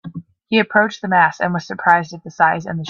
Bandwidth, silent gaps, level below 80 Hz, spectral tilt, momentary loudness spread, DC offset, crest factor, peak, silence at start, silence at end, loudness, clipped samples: 7.2 kHz; none; -60 dBFS; -5.5 dB/octave; 13 LU; under 0.1%; 18 dB; 0 dBFS; 0.05 s; 0 s; -16 LUFS; under 0.1%